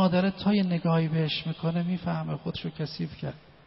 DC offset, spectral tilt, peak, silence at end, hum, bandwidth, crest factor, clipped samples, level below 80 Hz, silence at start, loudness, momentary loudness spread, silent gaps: under 0.1%; -6 dB/octave; -14 dBFS; 0.25 s; none; 5.8 kHz; 14 dB; under 0.1%; -58 dBFS; 0 s; -28 LUFS; 9 LU; none